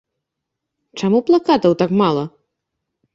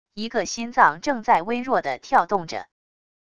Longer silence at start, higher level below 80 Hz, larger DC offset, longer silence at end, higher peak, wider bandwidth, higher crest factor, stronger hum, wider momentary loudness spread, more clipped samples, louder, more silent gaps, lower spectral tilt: first, 0.95 s vs 0.15 s; about the same, -56 dBFS vs -60 dBFS; second, under 0.1% vs 0.5%; about the same, 0.85 s vs 0.75 s; about the same, -2 dBFS vs 0 dBFS; second, 7.6 kHz vs 11 kHz; second, 16 dB vs 22 dB; neither; first, 12 LU vs 9 LU; neither; first, -16 LUFS vs -22 LUFS; neither; first, -7 dB/octave vs -3.5 dB/octave